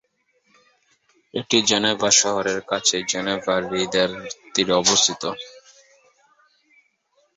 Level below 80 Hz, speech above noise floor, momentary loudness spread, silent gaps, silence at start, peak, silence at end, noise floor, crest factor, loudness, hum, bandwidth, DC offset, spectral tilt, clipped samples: -60 dBFS; 45 dB; 15 LU; none; 1.35 s; -2 dBFS; 1.75 s; -66 dBFS; 22 dB; -19 LUFS; none; 8.4 kHz; under 0.1%; -1.5 dB/octave; under 0.1%